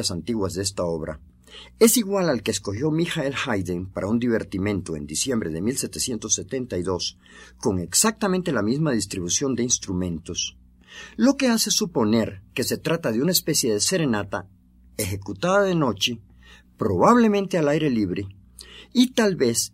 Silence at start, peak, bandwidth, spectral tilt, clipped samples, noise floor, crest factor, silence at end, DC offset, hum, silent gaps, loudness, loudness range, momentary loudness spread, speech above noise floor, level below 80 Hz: 0 s; -2 dBFS; 16 kHz; -4 dB/octave; under 0.1%; -50 dBFS; 20 dB; 0.05 s; under 0.1%; none; none; -23 LUFS; 4 LU; 10 LU; 27 dB; -52 dBFS